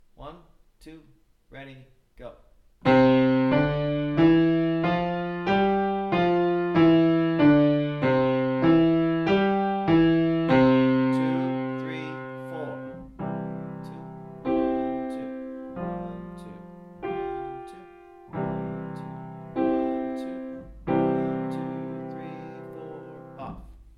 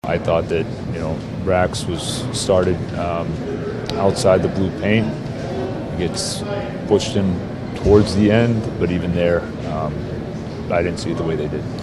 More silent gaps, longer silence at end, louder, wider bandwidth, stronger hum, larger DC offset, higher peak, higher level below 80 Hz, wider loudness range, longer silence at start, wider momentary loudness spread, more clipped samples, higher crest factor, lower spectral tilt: neither; about the same, 0.1 s vs 0 s; second, -24 LUFS vs -20 LUFS; second, 6 kHz vs 13 kHz; neither; neither; second, -8 dBFS vs 0 dBFS; second, -52 dBFS vs -38 dBFS; first, 12 LU vs 3 LU; first, 0.2 s vs 0.05 s; first, 21 LU vs 10 LU; neither; about the same, 18 dB vs 18 dB; first, -9 dB/octave vs -6 dB/octave